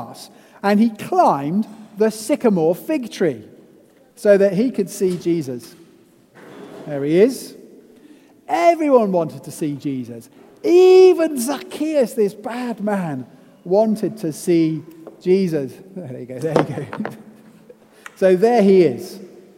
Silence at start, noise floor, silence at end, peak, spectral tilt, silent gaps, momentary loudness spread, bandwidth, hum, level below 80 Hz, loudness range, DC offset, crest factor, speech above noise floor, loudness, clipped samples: 0 s; -51 dBFS; 0.2 s; 0 dBFS; -6.5 dB/octave; none; 18 LU; 16 kHz; none; -68 dBFS; 6 LU; under 0.1%; 18 dB; 34 dB; -18 LUFS; under 0.1%